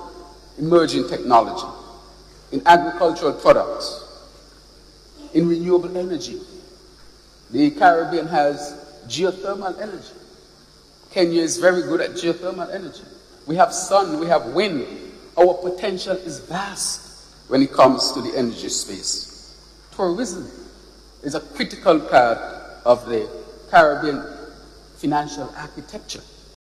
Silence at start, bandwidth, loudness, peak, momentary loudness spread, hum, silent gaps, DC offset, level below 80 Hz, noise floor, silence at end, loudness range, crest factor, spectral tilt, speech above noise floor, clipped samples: 0 s; 14 kHz; -20 LUFS; -2 dBFS; 20 LU; none; none; under 0.1%; -50 dBFS; -49 dBFS; 0.5 s; 6 LU; 20 dB; -4 dB/octave; 30 dB; under 0.1%